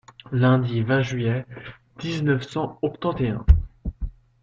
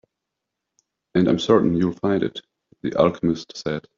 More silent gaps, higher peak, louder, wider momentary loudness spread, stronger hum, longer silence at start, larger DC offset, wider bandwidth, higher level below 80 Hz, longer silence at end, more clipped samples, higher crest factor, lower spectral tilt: neither; about the same, -2 dBFS vs -2 dBFS; second, -24 LUFS vs -21 LUFS; first, 18 LU vs 11 LU; neither; second, 0.3 s vs 1.15 s; neither; about the same, 7.6 kHz vs 7.4 kHz; first, -30 dBFS vs -56 dBFS; about the same, 0.3 s vs 0.2 s; neither; about the same, 20 dB vs 20 dB; first, -7.5 dB/octave vs -6 dB/octave